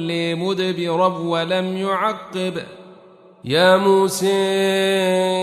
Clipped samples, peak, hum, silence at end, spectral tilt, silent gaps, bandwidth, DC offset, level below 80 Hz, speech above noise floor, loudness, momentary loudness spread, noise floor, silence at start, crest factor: under 0.1%; -2 dBFS; none; 0 s; -4.5 dB/octave; none; 13.5 kHz; under 0.1%; -66 dBFS; 28 dB; -19 LUFS; 11 LU; -47 dBFS; 0 s; 18 dB